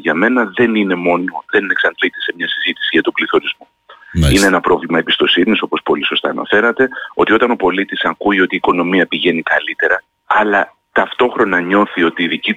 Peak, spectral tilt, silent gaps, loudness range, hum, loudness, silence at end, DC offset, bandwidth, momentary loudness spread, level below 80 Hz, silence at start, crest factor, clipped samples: -2 dBFS; -4.5 dB/octave; none; 2 LU; none; -14 LUFS; 0 s; under 0.1%; 16 kHz; 5 LU; -34 dBFS; 0 s; 12 dB; under 0.1%